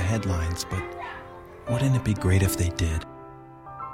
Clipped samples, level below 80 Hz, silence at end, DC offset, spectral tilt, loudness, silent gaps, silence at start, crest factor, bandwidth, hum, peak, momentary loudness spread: under 0.1%; -38 dBFS; 0 s; under 0.1%; -5.5 dB/octave; -26 LUFS; none; 0 s; 18 dB; 16.5 kHz; none; -8 dBFS; 21 LU